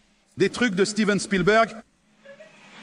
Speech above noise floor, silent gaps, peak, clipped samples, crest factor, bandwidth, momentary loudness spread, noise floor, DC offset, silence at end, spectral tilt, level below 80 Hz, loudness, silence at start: 29 dB; none; -6 dBFS; under 0.1%; 18 dB; 11 kHz; 6 LU; -51 dBFS; under 0.1%; 0 s; -4.5 dB/octave; -54 dBFS; -22 LUFS; 0.35 s